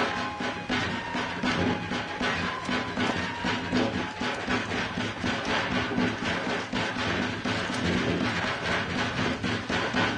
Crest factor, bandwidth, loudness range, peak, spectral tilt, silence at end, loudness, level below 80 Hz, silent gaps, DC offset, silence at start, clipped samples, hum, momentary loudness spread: 16 dB; 10.5 kHz; 1 LU; -14 dBFS; -4.5 dB/octave; 0 s; -28 LUFS; -50 dBFS; none; under 0.1%; 0 s; under 0.1%; none; 4 LU